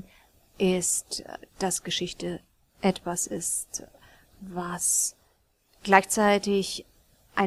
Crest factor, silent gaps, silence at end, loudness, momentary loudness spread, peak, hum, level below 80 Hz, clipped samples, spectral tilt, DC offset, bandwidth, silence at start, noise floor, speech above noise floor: 26 dB; none; 0 s; -26 LUFS; 16 LU; -2 dBFS; none; -58 dBFS; under 0.1%; -3 dB/octave; under 0.1%; 16 kHz; 0.6 s; -67 dBFS; 40 dB